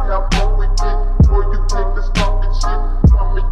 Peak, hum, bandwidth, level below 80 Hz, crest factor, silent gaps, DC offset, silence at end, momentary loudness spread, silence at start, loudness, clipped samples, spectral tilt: -2 dBFS; none; 8.6 kHz; -12 dBFS; 10 dB; none; under 0.1%; 0 s; 7 LU; 0 s; -17 LUFS; under 0.1%; -6 dB/octave